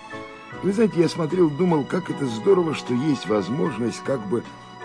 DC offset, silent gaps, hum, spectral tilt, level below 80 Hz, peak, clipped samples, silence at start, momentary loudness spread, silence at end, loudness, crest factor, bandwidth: under 0.1%; none; none; -7 dB/octave; -60 dBFS; -6 dBFS; under 0.1%; 0 s; 9 LU; 0 s; -23 LUFS; 16 dB; 10.5 kHz